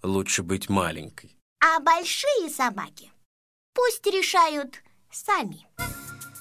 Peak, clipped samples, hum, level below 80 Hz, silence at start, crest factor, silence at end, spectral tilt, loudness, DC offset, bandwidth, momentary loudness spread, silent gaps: -4 dBFS; under 0.1%; none; -52 dBFS; 0.05 s; 22 dB; 0 s; -3 dB/octave; -24 LUFS; under 0.1%; 16 kHz; 18 LU; 1.41-1.56 s, 3.25-3.73 s